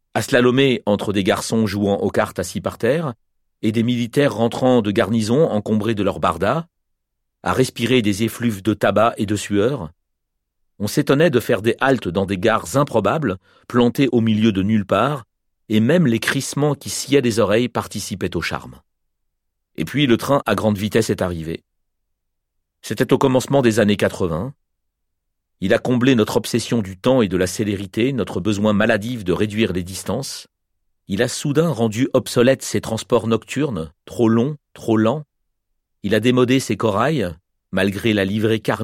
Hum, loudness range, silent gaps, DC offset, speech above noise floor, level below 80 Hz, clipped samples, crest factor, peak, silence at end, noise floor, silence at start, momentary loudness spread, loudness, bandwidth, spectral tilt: none; 3 LU; none; under 0.1%; 57 dB; -50 dBFS; under 0.1%; 16 dB; -2 dBFS; 0 s; -75 dBFS; 0.15 s; 9 LU; -19 LUFS; 16.5 kHz; -5.5 dB/octave